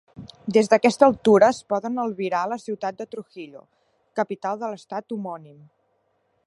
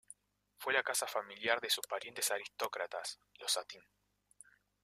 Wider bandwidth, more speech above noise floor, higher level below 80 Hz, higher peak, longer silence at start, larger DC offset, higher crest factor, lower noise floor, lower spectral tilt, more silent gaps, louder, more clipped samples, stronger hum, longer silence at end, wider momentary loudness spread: second, 11.5 kHz vs 15.5 kHz; first, 47 dB vs 30 dB; first, -64 dBFS vs -86 dBFS; first, -2 dBFS vs -14 dBFS; second, 0.2 s vs 0.6 s; neither; about the same, 22 dB vs 26 dB; about the same, -69 dBFS vs -68 dBFS; first, -5.5 dB/octave vs 0.5 dB/octave; neither; first, -22 LUFS vs -37 LUFS; neither; second, none vs 50 Hz at -80 dBFS; about the same, 1 s vs 1.05 s; first, 20 LU vs 12 LU